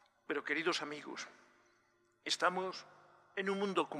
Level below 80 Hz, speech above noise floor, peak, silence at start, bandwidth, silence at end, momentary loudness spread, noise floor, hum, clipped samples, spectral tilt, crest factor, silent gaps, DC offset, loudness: under -90 dBFS; 36 dB; -18 dBFS; 0.3 s; 14 kHz; 0 s; 14 LU; -74 dBFS; none; under 0.1%; -3.5 dB/octave; 22 dB; none; under 0.1%; -38 LUFS